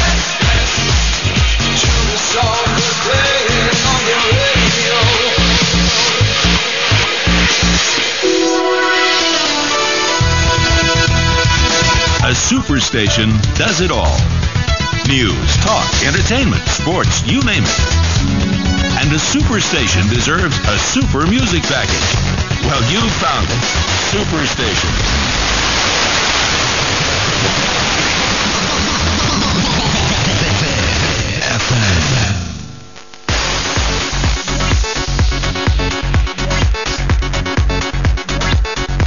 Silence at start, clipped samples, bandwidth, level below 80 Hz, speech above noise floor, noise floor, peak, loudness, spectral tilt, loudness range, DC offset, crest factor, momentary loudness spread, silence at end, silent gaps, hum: 0 s; under 0.1%; 7.4 kHz; -22 dBFS; 23 dB; -36 dBFS; 0 dBFS; -13 LUFS; -3.5 dB/octave; 5 LU; 2%; 14 dB; 5 LU; 0 s; none; none